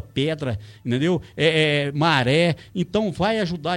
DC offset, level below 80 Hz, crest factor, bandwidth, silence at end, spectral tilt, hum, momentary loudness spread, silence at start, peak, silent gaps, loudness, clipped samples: under 0.1%; -50 dBFS; 18 dB; 12 kHz; 0 s; -6 dB/octave; none; 10 LU; 0.05 s; -4 dBFS; none; -21 LUFS; under 0.1%